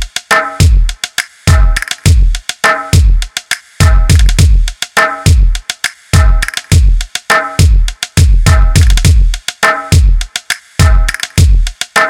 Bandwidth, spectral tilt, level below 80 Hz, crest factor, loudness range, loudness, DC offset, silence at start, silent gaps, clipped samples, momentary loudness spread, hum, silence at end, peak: 16.5 kHz; -4 dB/octave; -10 dBFS; 8 dB; 1 LU; -11 LUFS; under 0.1%; 0 s; none; 2%; 8 LU; none; 0 s; 0 dBFS